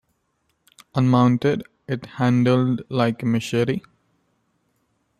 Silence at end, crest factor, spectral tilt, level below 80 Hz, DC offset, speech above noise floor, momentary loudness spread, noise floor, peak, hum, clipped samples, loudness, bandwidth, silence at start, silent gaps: 1.4 s; 18 dB; -7.5 dB/octave; -60 dBFS; under 0.1%; 51 dB; 12 LU; -70 dBFS; -4 dBFS; none; under 0.1%; -21 LUFS; 12 kHz; 0.95 s; none